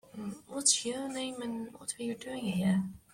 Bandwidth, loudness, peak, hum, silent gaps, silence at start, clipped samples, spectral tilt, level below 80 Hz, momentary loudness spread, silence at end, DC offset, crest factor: 16 kHz; -32 LUFS; -12 dBFS; none; none; 0.15 s; under 0.1%; -3.5 dB/octave; -68 dBFS; 13 LU; 0.15 s; under 0.1%; 24 dB